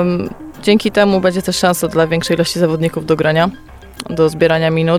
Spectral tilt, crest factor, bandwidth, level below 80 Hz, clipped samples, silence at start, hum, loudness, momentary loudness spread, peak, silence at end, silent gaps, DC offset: -5.5 dB/octave; 14 dB; 16 kHz; -42 dBFS; under 0.1%; 0 s; none; -14 LUFS; 7 LU; 0 dBFS; 0 s; none; under 0.1%